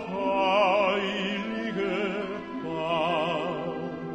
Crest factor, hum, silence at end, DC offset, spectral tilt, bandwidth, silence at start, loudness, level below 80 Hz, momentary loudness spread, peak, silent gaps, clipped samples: 16 dB; none; 0 s; under 0.1%; -5.5 dB/octave; 9.2 kHz; 0 s; -27 LUFS; -62 dBFS; 11 LU; -10 dBFS; none; under 0.1%